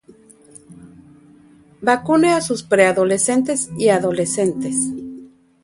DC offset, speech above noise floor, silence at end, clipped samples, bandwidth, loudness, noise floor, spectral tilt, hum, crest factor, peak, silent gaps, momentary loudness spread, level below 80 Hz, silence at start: under 0.1%; 32 dB; 0.4 s; under 0.1%; 11.5 kHz; -17 LUFS; -49 dBFS; -4 dB/octave; none; 20 dB; 0 dBFS; none; 7 LU; -60 dBFS; 0.7 s